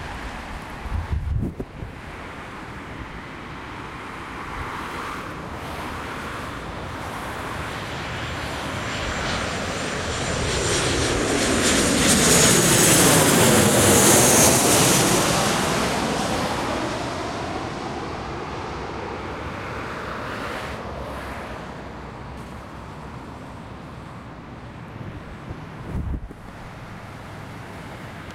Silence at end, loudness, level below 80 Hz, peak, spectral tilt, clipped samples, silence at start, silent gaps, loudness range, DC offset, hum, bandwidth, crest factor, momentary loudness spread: 0 s; -21 LUFS; -40 dBFS; -4 dBFS; -3 dB/octave; under 0.1%; 0 s; none; 20 LU; under 0.1%; none; 16.5 kHz; 20 dB; 23 LU